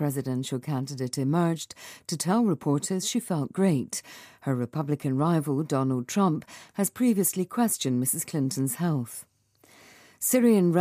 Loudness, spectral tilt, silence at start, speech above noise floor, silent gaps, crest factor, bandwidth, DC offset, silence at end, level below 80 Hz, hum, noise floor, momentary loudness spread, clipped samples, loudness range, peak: -27 LUFS; -5.5 dB/octave; 0 s; 33 dB; none; 16 dB; 15.5 kHz; under 0.1%; 0 s; -72 dBFS; none; -60 dBFS; 11 LU; under 0.1%; 2 LU; -10 dBFS